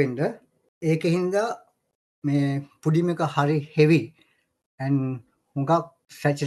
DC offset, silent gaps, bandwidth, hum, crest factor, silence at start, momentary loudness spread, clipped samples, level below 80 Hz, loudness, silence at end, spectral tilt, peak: under 0.1%; 0.68-0.81 s, 1.95-2.22 s, 4.66-4.78 s; 12.5 kHz; none; 20 dB; 0 s; 15 LU; under 0.1%; -68 dBFS; -24 LUFS; 0 s; -7.5 dB/octave; -6 dBFS